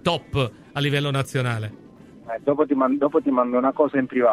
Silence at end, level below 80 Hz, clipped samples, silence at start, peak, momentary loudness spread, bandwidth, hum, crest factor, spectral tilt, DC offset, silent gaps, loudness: 0 s; -54 dBFS; under 0.1%; 0.05 s; -6 dBFS; 7 LU; 13.5 kHz; none; 16 dB; -6.5 dB/octave; under 0.1%; none; -22 LUFS